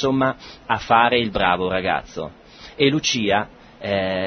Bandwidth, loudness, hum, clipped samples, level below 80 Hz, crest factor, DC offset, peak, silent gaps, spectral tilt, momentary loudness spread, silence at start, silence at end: 6.6 kHz; -20 LUFS; none; under 0.1%; -48 dBFS; 20 dB; under 0.1%; -2 dBFS; none; -4 dB/octave; 17 LU; 0 s; 0 s